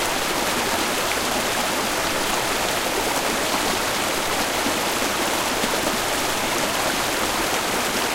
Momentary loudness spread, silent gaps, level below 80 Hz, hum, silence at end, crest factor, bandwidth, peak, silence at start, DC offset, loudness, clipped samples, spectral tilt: 1 LU; none; -44 dBFS; none; 0 s; 18 dB; 16 kHz; -4 dBFS; 0 s; under 0.1%; -21 LUFS; under 0.1%; -1.5 dB/octave